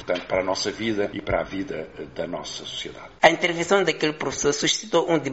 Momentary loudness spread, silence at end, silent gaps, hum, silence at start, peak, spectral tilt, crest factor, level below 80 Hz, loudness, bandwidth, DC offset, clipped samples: 14 LU; 0 s; none; none; 0 s; -2 dBFS; -2.5 dB/octave; 22 dB; -50 dBFS; -24 LUFS; 8 kHz; 0.1%; under 0.1%